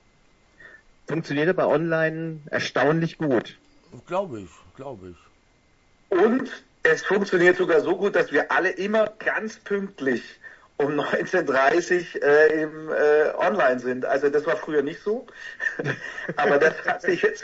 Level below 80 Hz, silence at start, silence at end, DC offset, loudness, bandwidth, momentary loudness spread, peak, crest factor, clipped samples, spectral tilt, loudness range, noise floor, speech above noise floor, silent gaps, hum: -62 dBFS; 0.6 s; 0 s; under 0.1%; -23 LUFS; 8 kHz; 12 LU; -4 dBFS; 18 dB; under 0.1%; -5.5 dB/octave; 6 LU; -60 dBFS; 38 dB; none; none